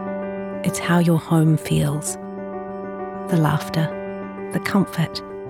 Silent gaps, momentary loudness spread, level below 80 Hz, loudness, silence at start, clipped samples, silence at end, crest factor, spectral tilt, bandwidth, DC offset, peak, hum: none; 13 LU; -52 dBFS; -22 LUFS; 0 s; under 0.1%; 0 s; 18 dB; -6 dB/octave; 16 kHz; under 0.1%; -4 dBFS; none